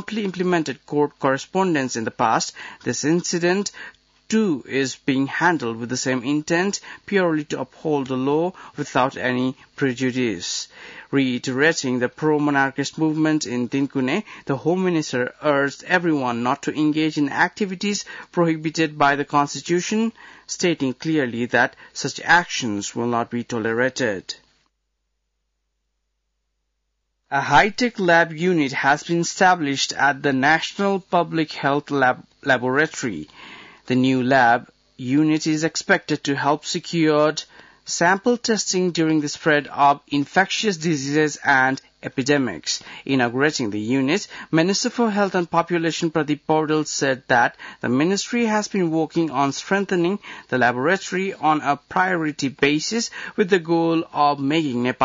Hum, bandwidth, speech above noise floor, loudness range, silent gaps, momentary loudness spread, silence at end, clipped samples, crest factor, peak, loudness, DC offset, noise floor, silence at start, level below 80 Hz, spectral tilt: none; 7.8 kHz; 54 dB; 3 LU; none; 8 LU; 0 s; under 0.1%; 16 dB; -4 dBFS; -21 LUFS; under 0.1%; -75 dBFS; 0 s; -62 dBFS; -4.5 dB/octave